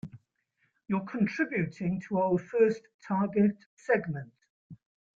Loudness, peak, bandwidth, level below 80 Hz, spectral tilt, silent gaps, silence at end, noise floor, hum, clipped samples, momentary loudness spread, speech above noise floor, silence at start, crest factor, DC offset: -30 LUFS; -12 dBFS; 7.4 kHz; -68 dBFS; -8.5 dB/octave; 2.94-2.99 s, 3.66-3.77 s, 4.50-4.70 s; 0.4 s; -76 dBFS; none; under 0.1%; 13 LU; 47 dB; 0.05 s; 18 dB; under 0.1%